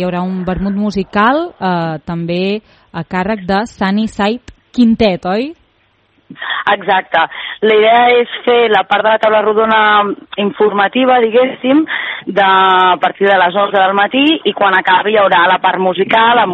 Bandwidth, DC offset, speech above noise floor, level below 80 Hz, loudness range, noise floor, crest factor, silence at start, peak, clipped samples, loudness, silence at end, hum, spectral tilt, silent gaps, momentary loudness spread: 8.4 kHz; under 0.1%; 44 dB; -44 dBFS; 6 LU; -55 dBFS; 12 dB; 0 s; 0 dBFS; under 0.1%; -12 LUFS; 0 s; none; -6.5 dB/octave; none; 9 LU